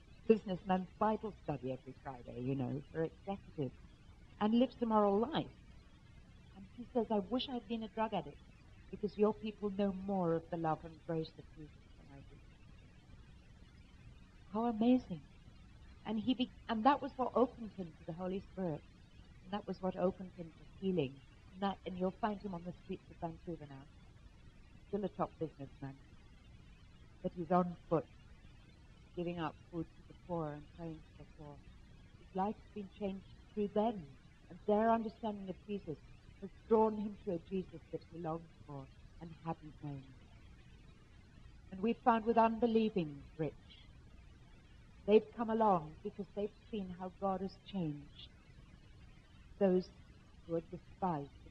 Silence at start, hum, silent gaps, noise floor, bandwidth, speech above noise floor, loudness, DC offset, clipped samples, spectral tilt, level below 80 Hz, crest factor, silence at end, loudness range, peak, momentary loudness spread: 0.1 s; none; none; -60 dBFS; 7.8 kHz; 22 dB; -38 LUFS; under 0.1%; under 0.1%; -8.5 dB/octave; -62 dBFS; 24 dB; 0 s; 10 LU; -14 dBFS; 22 LU